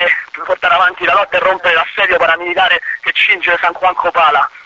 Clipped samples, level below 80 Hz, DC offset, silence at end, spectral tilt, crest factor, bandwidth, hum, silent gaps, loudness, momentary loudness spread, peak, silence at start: under 0.1%; -50 dBFS; under 0.1%; 0.05 s; -3 dB/octave; 12 dB; 8 kHz; none; none; -12 LUFS; 4 LU; 0 dBFS; 0 s